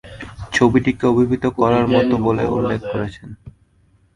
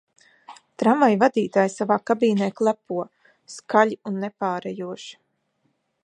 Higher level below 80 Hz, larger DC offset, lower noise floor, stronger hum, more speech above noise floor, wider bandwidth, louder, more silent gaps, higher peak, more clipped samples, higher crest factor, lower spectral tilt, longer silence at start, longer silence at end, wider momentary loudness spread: first, -42 dBFS vs -74 dBFS; neither; second, -56 dBFS vs -71 dBFS; neither; second, 39 dB vs 49 dB; about the same, 11 kHz vs 10.5 kHz; first, -17 LUFS vs -22 LUFS; neither; about the same, 0 dBFS vs -2 dBFS; neither; about the same, 18 dB vs 22 dB; about the same, -7 dB/octave vs -6 dB/octave; second, 0.05 s vs 0.5 s; second, 0.65 s vs 0.9 s; about the same, 18 LU vs 18 LU